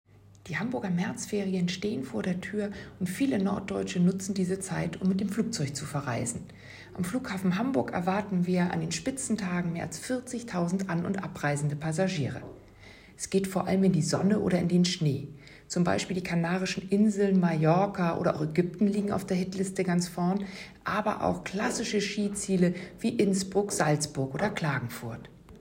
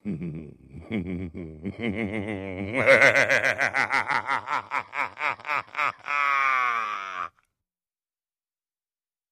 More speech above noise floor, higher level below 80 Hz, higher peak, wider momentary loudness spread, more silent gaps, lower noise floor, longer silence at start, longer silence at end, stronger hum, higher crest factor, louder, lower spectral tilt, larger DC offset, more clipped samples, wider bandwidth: second, 23 dB vs over 66 dB; about the same, -60 dBFS vs -58 dBFS; second, -12 dBFS vs -2 dBFS; second, 9 LU vs 17 LU; neither; second, -52 dBFS vs under -90 dBFS; first, 0.45 s vs 0.05 s; second, 0 s vs 2 s; neither; second, 18 dB vs 24 dB; second, -29 LUFS vs -24 LUFS; about the same, -5.5 dB/octave vs -4.5 dB/octave; neither; neither; first, 16 kHz vs 14.5 kHz